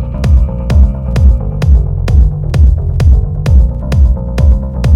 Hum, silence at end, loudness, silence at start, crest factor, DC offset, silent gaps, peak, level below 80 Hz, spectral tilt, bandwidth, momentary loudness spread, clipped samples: none; 0 s; -11 LUFS; 0 s; 8 dB; under 0.1%; none; 0 dBFS; -10 dBFS; -8.5 dB/octave; 7 kHz; 2 LU; 0.6%